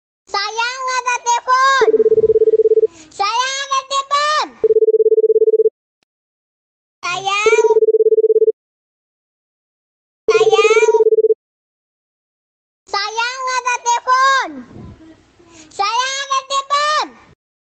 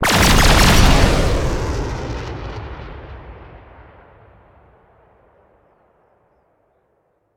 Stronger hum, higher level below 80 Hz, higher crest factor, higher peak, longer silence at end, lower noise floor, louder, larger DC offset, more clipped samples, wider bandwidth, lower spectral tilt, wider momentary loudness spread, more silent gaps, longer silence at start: neither; second, -58 dBFS vs -22 dBFS; about the same, 16 dB vs 18 dB; about the same, 0 dBFS vs 0 dBFS; second, 0.65 s vs 3.8 s; second, -45 dBFS vs -64 dBFS; about the same, -15 LUFS vs -15 LUFS; neither; neither; second, 8.6 kHz vs 18.5 kHz; second, -1 dB/octave vs -4 dB/octave; second, 9 LU vs 25 LU; first, 5.71-7.02 s, 8.53-10.28 s, 11.35-12.86 s vs none; first, 0.35 s vs 0 s